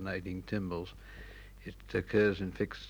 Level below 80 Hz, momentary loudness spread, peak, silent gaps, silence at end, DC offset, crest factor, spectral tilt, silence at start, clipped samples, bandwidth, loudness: -52 dBFS; 21 LU; -16 dBFS; none; 0 s; under 0.1%; 20 dB; -7 dB/octave; 0 s; under 0.1%; over 20 kHz; -34 LUFS